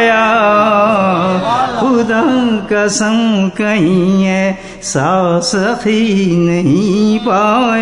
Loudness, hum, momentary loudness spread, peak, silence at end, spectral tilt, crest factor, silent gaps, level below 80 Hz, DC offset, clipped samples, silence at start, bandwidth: -12 LUFS; none; 4 LU; 0 dBFS; 0 s; -5.5 dB/octave; 12 dB; none; -44 dBFS; 0.2%; under 0.1%; 0 s; 11 kHz